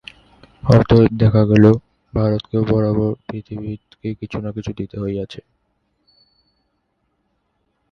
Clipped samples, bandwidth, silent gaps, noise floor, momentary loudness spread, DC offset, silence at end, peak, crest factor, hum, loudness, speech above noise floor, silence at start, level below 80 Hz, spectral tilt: under 0.1%; 6.6 kHz; none; -69 dBFS; 17 LU; under 0.1%; 2.5 s; 0 dBFS; 18 dB; none; -17 LUFS; 53 dB; 0.65 s; -40 dBFS; -9.5 dB/octave